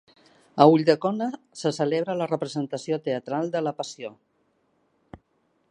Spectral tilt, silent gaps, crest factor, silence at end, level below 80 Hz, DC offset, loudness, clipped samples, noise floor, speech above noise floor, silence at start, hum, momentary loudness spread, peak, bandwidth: -6 dB/octave; none; 24 dB; 0.55 s; -68 dBFS; under 0.1%; -24 LUFS; under 0.1%; -69 dBFS; 46 dB; 0.55 s; none; 16 LU; 0 dBFS; 10.5 kHz